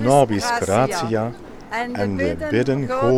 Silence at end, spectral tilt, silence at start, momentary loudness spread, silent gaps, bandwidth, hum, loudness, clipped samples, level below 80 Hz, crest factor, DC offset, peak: 0 s; -5.5 dB/octave; 0 s; 10 LU; none; 16.5 kHz; none; -21 LUFS; under 0.1%; -44 dBFS; 18 dB; under 0.1%; -2 dBFS